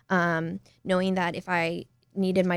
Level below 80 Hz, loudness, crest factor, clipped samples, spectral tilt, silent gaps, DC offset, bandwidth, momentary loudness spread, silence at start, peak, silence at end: -62 dBFS; -27 LUFS; 16 dB; under 0.1%; -6.5 dB/octave; none; under 0.1%; 11.5 kHz; 13 LU; 0.1 s; -10 dBFS; 0 s